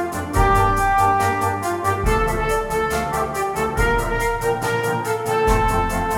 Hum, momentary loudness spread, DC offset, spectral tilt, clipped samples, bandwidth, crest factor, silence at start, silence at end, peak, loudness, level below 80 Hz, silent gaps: none; 5 LU; under 0.1%; -5 dB/octave; under 0.1%; 18 kHz; 16 dB; 0 s; 0 s; -2 dBFS; -20 LUFS; -28 dBFS; none